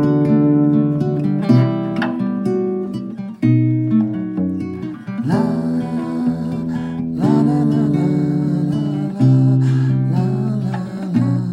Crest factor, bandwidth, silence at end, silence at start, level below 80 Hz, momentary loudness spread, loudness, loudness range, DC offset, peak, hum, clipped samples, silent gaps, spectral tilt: 14 dB; 8.2 kHz; 0 s; 0 s; -52 dBFS; 9 LU; -18 LUFS; 3 LU; under 0.1%; -2 dBFS; none; under 0.1%; none; -9.5 dB/octave